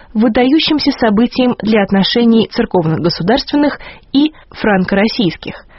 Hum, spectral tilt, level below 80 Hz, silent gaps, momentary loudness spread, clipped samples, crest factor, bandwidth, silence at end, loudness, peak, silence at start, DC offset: none; -4 dB/octave; -40 dBFS; none; 6 LU; under 0.1%; 12 dB; 6 kHz; 0.15 s; -13 LUFS; 0 dBFS; 0.15 s; under 0.1%